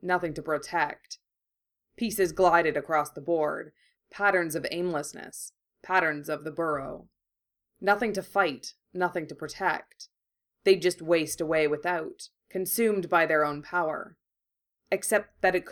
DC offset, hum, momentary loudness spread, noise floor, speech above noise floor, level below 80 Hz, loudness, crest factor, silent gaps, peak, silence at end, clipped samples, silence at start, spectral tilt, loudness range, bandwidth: under 0.1%; none; 16 LU; -87 dBFS; 60 dB; -62 dBFS; -28 LUFS; 20 dB; none; -8 dBFS; 0 s; under 0.1%; 0.05 s; -4 dB/octave; 3 LU; 19.5 kHz